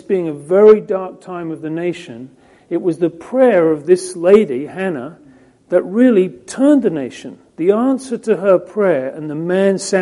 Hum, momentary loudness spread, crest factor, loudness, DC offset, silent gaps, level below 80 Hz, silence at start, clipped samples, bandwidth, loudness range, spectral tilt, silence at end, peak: none; 15 LU; 16 dB; -15 LUFS; under 0.1%; none; -60 dBFS; 0.1 s; under 0.1%; 11.5 kHz; 2 LU; -6.5 dB/octave; 0 s; 0 dBFS